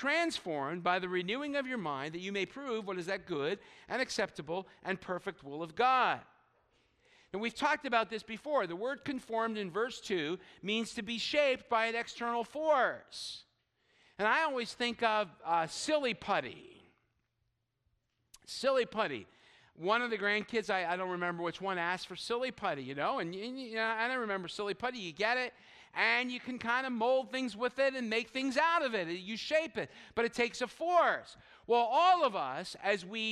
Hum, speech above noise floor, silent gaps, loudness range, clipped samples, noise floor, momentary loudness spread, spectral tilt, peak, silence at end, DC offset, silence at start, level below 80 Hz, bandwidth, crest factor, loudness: none; 48 dB; none; 5 LU; under 0.1%; -82 dBFS; 10 LU; -3.5 dB/octave; -14 dBFS; 0 s; under 0.1%; 0 s; -74 dBFS; 13 kHz; 20 dB; -34 LUFS